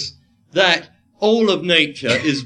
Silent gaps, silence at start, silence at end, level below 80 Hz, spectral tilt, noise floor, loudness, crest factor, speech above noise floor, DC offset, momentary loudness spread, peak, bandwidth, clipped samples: none; 0 s; 0 s; -60 dBFS; -4 dB/octave; -37 dBFS; -16 LUFS; 18 dB; 21 dB; under 0.1%; 7 LU; 0 dBFS; 11 kHz; under 0.1%